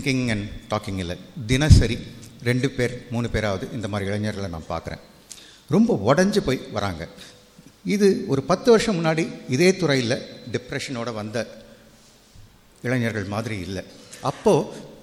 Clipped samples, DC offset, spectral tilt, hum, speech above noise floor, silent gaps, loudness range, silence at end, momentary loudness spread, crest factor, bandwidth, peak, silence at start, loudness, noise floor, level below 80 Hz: under 0.1%; under 0.1%; -6 dB/octave; none; 30 dB; none; 8 LU; 0.05 s; 16 LU; 22 dB; 15 kHz; 0 dBFS; 0 s; -23 LUFS; -52 dBFS; -36 dBFS